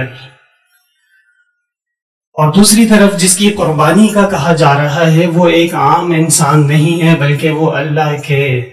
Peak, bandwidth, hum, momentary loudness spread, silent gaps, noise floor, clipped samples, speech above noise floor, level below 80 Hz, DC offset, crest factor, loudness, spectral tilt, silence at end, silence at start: 0 dBFS; 15.5 kHz; none; 7 LU; 2.02-2.21 s, 2.27-2.32 s; -71 dBFS; 0.2%; 62 dB; -44 dBFS; under 0.1%; 10 dB; -9 LUFS; -5 dB/octave; 0 s; 0 s